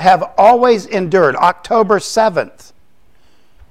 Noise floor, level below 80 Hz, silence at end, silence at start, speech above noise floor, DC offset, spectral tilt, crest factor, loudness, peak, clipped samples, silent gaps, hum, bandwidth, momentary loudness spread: -55 dBFS; -50 dBFS; 1.2 s; 0 s; 43 dB; 0.8%; -5 dB/octave; 14 dB; -12 LUFS; 0 dBFS; under 0.1%; none; none; 14.5 kHz; 6 LU